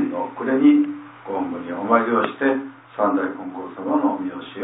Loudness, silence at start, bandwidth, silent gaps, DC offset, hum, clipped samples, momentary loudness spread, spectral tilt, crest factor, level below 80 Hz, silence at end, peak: -21 LUFS; 0 s; 4 kHz; none; under 0.1%; none; under 0.1%; 14 LU; -10 dB/octave; 18 dB; -72 dBFS; 0 s; -4 dBFS